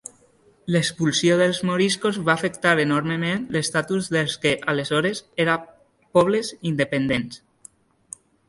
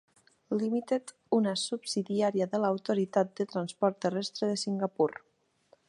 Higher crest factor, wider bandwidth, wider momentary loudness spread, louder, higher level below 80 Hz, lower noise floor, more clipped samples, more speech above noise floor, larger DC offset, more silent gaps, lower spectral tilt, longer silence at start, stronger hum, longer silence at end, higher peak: about the same, 20 dB vs 18 dB; about the same, 11.5 kHz vs 11.5 kHz; first, 8 LU vs 5 LU; first, -22 LUFS vs -31 LUFS; first, -58 dBFS vs -82 dBFS; second, -57 dBFS vs -66 dBFS; neither; about the same, 36 dB vs 36 dB; neither; neither; about the same, -4.5 dB/octave vs -5 dB/octave; first, 0.65 s vs 0.5 s; neither; first, 1.1 s vs 0.75 s; first, -4 dBFS vs -12 dBFS